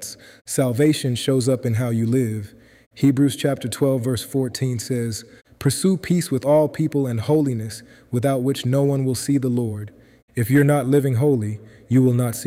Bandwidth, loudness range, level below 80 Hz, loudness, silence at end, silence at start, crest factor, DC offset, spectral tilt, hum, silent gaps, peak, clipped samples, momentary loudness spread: 16 kHz; 2 LU; -56 dBFS; -21 LUFS; 0 s; 0 s; 14 dB; under 0.1%; -6.5 dB/octave; none; 0.41-0.45 s, 2.86-2.91 s, 10.22-10.28 s; -6 dBFS; under 0.1%; 11 LU